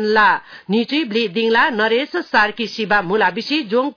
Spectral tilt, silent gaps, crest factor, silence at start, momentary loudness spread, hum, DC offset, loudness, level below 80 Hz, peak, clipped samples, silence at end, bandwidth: -5 dB/octave; none; 14 dB; 0 s; 6 LU; none; under 0.1%; -17 LUFS; -56 dBFS; -4 dBFS; under 0.1%; 0.05 s; 5.4 kHz